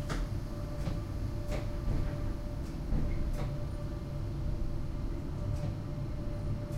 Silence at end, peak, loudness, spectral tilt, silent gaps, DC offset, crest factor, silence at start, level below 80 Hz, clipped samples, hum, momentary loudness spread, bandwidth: 0 s; -20 dBFS; -38 LUFS; -7.5 dB/octave; none; under 0.1%; 14 dB; 0 s; -36 dBFS; under 0.1%; none; 3 LU; 14.5 kHz